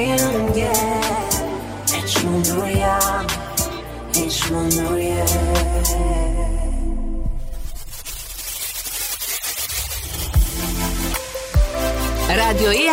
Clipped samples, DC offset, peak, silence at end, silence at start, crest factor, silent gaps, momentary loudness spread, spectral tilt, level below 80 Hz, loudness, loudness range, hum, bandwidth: under 0.1%; under 0.1%; -6 dBFS; 0 s; 0 s; 14 dB; none; 10 LU; -3.5 dB/octave; -24 dBFS; -20 LUFS; 6 LU; none; 16.5 kHz